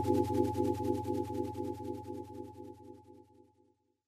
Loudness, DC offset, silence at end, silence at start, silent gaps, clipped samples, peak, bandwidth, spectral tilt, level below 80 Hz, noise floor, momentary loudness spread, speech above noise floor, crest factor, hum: -36 LUFS; under 0.1%; 0.85 s; 0 s; none; under 0.1%; -16 dBFS; 14.5 kHz; -8 dB/octave; -64 dBFS; -72 dBFS; 19 LU; 38 dB; 20 dB; none